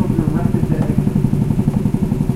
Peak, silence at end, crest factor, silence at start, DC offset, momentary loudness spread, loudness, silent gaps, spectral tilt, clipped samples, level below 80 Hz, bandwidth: -2 dBFS; 0 s; 14 dB; 0 s; under 0.1%; 1 LU; -17 LUFS; none; -9 dB/octave; under 0.1%; -28 dBFS; 14.5 kHz